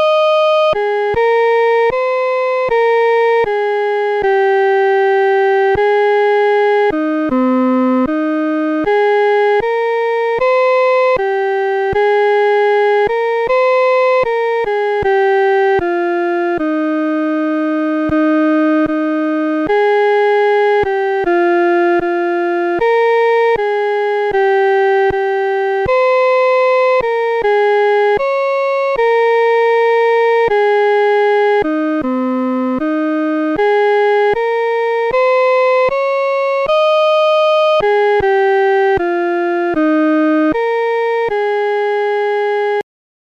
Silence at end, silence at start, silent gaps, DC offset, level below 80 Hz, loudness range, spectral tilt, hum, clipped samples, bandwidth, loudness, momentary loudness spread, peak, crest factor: 0.45 s; 0 s; none; under 0.1%; -46 dBFS; 2 LU; -5.5 dB/octave; none; under 0.1%; 7.2 kHz; -13 LUFS; 4 LU; -6 dBFS; 8 dB